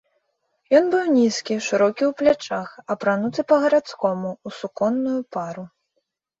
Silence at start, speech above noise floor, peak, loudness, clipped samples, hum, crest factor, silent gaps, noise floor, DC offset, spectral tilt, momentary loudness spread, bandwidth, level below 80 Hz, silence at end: 0.7 s; 54 dB; -4 dBFS; -21 LUFS; under 0.1%; none; 18 dB; none; -74 dBFS; under 0.1%; -5 dB/octave; 12 LU; 8 kHz; -66 dBFS; 0.75 s